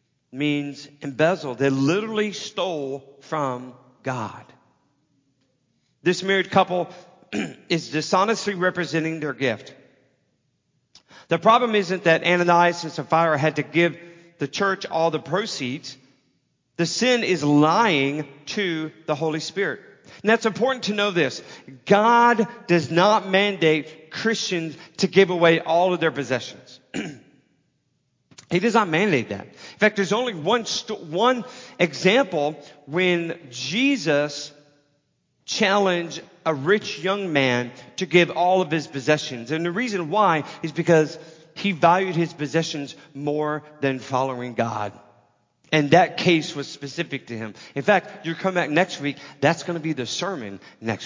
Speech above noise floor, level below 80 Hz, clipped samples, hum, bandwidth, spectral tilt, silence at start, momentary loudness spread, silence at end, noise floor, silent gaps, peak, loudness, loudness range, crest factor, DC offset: 48 dB; -70 dBFS; under 0.1%; none; 7.6 kHz; -5 dB/octave; 0.35 s; 14 LU; 0 s; -70 dBFS; none; -2 dBFS; -22 LUFS; 6 LU; 22 dB; under 0.1%